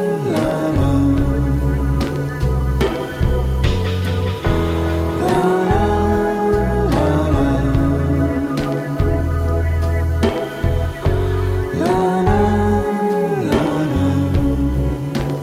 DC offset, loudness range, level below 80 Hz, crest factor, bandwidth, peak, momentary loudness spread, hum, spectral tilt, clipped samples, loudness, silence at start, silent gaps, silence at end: under 0.1%; 2 LU; -24 dBFS; 12 dB; 15.5 kHz; -4 dBFS; 4 LU; none; -7.5 dB/octave; under 0.1%; -18 LUFS; 0 s; none; 0 s